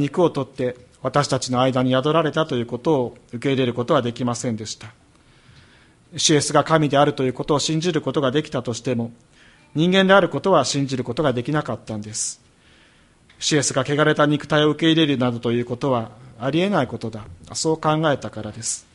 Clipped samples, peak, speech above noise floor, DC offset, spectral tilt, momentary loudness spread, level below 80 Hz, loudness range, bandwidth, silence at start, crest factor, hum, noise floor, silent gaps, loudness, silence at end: under 0.1%; -2 dBFS; 34 dB; under 0.1%; -4.5 dB/octave; 12 LU; -54 dBFS; 4 LU; 11.5 kHz; 0 s; 20 dB; none; -54 dBFS; none; -21 LUFS; 0.15 s